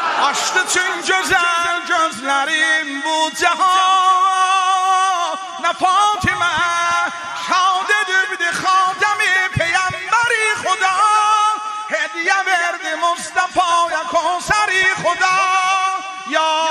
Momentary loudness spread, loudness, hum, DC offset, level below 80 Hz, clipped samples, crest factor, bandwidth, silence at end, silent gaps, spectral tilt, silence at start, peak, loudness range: 6 LU; -16 LUFS; none; under 0.1%; -50 dBFS; under 0.1%; 16 dB; 13 kHz; 0 s; none; -1.5 dB/octave; 0 s; -2 dBFS; 2 LU